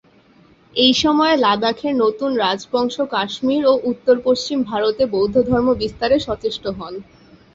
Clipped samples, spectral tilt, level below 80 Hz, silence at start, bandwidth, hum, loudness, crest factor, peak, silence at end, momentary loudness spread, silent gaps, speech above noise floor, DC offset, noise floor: under 0.1%; -4.5 dB/octave; -46 dBFS; 0.75 s; 7.8 kHz; none; -18 LUFS; 16 dB; -2 dBFS; 0.55 s; 9 LU; none; 34 dB; under 0.1%; -51 dBFS